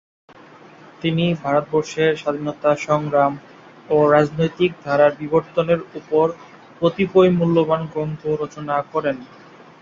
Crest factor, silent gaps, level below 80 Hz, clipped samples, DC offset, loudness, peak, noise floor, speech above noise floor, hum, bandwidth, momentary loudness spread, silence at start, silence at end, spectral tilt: 18 dB; none; -56 dBFS; under 0.1%; under 0.1%; -19 LUFS; -2 dBFS; -44 dBFS; 26 dB; none; 7.6 kHz; 9 LU; 1.05 s; 0.55 s; -7 dB/octave